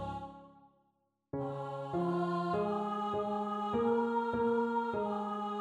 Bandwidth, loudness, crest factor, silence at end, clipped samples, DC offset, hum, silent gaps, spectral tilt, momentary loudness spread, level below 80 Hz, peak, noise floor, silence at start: 10.5 kHz; -35 LUFS; 14 dB; 0 s; under 0.1%; under 0.1%; none; none; -8 dB/octave; 9 LU; -64 dBFS; -22 dBFS; -79 dBFS; 0 s